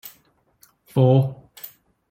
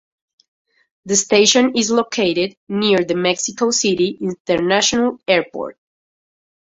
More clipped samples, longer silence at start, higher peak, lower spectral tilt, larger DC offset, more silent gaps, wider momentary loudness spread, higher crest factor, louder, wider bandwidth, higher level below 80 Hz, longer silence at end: neither; second, 0.05 s vs 1.05 s; second, -4 dBFS vs 0 dBFS; first, -9 dB/octave vs -3 dB/octave; neither; second, none vs 2.57-2.67 s, 4.40-4.45 s; first, 23 LU vs 9 LU; about the same, 18 dB vs 18 dB; second, -20 LUFS vs -16 LUFS; first, 16 kHz vs 8.2 kHz; about the same, -60 dBFS vs -58 dBFS; second, 0.45 s vs 1.05 s